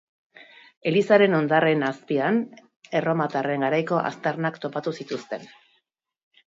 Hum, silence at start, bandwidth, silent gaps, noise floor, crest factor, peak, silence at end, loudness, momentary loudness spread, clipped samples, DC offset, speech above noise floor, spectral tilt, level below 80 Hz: none; 0.85 s; 7.8 kHz; 2.76-2.81 s; -72 dBFS; 22 dB; -4 dBFS; 1 s; -23 LUFS; 14 LU; under 0.1%; under 0.1%; 49 dB; -7 dB/octave; -74 dBFS